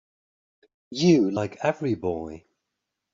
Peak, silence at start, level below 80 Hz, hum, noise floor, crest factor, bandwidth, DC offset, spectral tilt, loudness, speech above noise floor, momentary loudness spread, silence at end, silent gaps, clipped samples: -8 dBFS; 0.9 s; -62 dBFS; none; -83 dBFS; 18 dB; 7.6 kHz; under 0.1%; -6 dB/octave; -24 LUFS; 59 dB; 16 LU; 0.75 s; none; under 0.1%